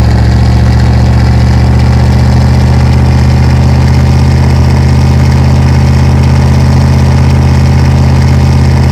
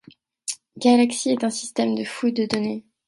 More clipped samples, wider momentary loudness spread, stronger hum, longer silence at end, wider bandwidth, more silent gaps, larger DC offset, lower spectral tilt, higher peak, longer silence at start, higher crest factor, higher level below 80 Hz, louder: first, 10% vs under 0.1%; second, 0 LU vs 14 LU; neither; second, 0 s vs 0.25 s; second, 10 kHz vs 11.5 kHz; neither; first, 3% vs under 0.1%; first, -7.5 dB/octave vs -4 dB/octave; first, 0 dBFS vs -4 dBFS; second, 0 s vs 0.45 s; second, 4 dB vs 18 dB; first, -10 dBFS vs -66 dBFS; first, -6 LUFS vs -22 LUFS